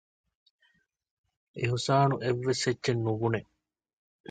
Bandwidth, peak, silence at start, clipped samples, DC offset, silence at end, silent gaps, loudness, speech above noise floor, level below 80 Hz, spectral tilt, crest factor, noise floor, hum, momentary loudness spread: 9.2 kHz; -12 dBFS; 1.55 s; under 0.1%; under 0.1%; 0.9 s; none; -29 LUFS; 43 dB; -64 dBFS; -5.5 dB/octave; 20 dB; -71 dBFS; none; 9 LU